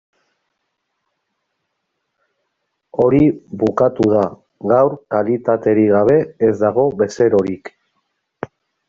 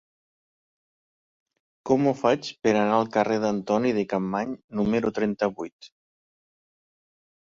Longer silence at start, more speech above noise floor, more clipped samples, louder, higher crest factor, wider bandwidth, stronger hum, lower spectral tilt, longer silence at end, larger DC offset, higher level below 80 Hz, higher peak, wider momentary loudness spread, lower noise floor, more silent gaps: first, 2.95 s vs 1.85 s; second, 59 dB vs over 66 dB; neither; first, -16 LUFS vs -25 LUFS; about the same, 16 dB vs 20 dB; about the same, 7.6 kHz vs 7.6 kHz; neither; first, -8 dB/octave vs -6.5 dB/octave; second, 1.2 s vs 1.7 s; neither; first, -50 dBFS vs -62 dBFS; first, -2 dBFS vs -6 dBFS; first, 15 LU vs 8 LU; second, -73 dBFS vs under -90 dBFS; second, none vs 4.64-4.68 s, 5.72-5.79 s